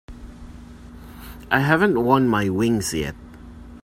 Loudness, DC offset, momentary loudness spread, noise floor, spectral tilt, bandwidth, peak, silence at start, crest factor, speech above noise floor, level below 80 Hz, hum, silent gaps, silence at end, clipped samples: -20 LUFS; under 0.1%; 24 LU; -40 dBFS; -5.5 dB/octave; 16 kHz; -2 dBFS; 0.1 s; 20 dB; 21 dB; -44 dBFS; none; none; 0.05 s; under 0.1%